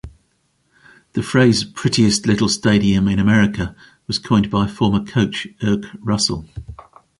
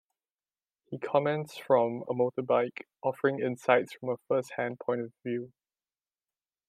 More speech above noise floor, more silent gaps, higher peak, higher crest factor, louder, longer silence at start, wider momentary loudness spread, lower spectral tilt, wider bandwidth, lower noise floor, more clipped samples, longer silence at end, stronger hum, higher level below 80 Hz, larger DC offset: second, 47 dB vs over 60 dB; neither; first, -2 dBFS vs -8 dBFS; second, 16 dB vs 24 dB; first, -17 LUFS vs -30 LUFS; second, 0.05 s vs 0.9 s; about the same, 12 LU vs 10 LU; second, -5 dB/octave vs -6.5 dB/octave; second, 11.5 kHz vs 14 kHz; second, -64 dBFS vs under -90 dBFS; neither; second, 0.4 s vs 1.2 s; neither; first, -40 dBFS vs -82 dBFS; neither